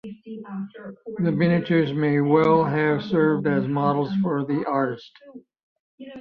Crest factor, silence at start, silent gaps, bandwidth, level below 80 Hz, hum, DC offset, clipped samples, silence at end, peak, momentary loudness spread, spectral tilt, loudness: 18 dB; 0.05 s; 5.63-5.98 s; 6 kHz; -62 dBFS; none; under 0.1%; under 0.1%; 0 s; -6 dBFS; 18 LU; -9.5 dB/octave; -22 LUFS